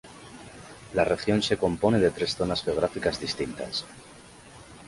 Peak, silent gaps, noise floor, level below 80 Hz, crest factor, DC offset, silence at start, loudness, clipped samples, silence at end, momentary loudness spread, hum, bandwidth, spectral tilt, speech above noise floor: -8 dBFS; none; -49 dBFS; -50 dBFS; 20 dB; under 0.1%; 0.05 s; -26 LUFS; under 0.1%; 0 s; 22 LU; none; 11.5 kHz; -5 dB/octave; 22 dB